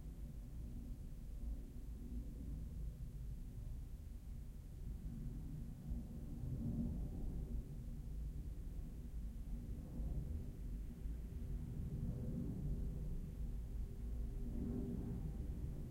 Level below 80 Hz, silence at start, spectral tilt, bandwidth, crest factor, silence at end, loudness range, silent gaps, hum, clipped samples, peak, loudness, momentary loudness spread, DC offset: -48 dBFS; 0 s; -8.5 dB/octave; 16 kHz; 14 dB; 0 s; 5 LU; none; none; under 0.1%; -32 dBFS; -49 LUFS; 8 LU; under 0.1%